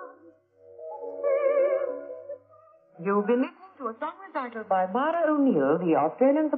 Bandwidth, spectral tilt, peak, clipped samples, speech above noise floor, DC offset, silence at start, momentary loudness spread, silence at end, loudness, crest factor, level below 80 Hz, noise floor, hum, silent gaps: 4.4 kHz; -6 dB/octave; -10 dBFS; under 0.1%; 32 dB; under 0.1%; 0 s; 18 LU; 0 s; -26 LUFS; 16 dB; -90 dBFS; -56 dBFS; none; none